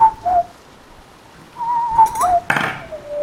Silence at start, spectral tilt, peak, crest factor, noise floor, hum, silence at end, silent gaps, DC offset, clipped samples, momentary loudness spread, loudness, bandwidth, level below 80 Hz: 0 s; -3.5 dB/octave; 0 dBFS; 18 dB; -43 dBFS; none; 0 s; none; under 0.1%; under 0.1%; 14 LU; -17 LUFS; 16.5 kHz; -46 dBFS